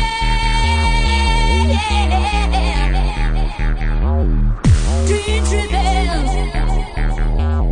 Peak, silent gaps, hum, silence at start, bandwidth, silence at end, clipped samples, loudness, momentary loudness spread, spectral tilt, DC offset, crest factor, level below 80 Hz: -2 dBFS; none; none; 0 s; 10.5 kHz; 0 s; under 0.1%; -17 LUFS; 6 LU; -5 dB/octave; under 0.1%; 12 dB; -16 dBFS